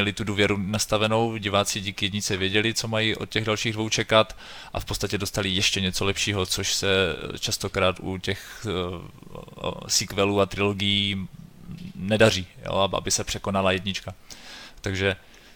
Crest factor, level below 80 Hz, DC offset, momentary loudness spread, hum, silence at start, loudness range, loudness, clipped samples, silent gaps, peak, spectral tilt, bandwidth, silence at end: 22 dB; -46 dBFS; under 0.1%; 13 LU; none; 0 s; 3 LU; -24 LUFS; under 0.1%; none; -4 dBFS; -3.5 dB/octave; over 20 kHz; 0.2 s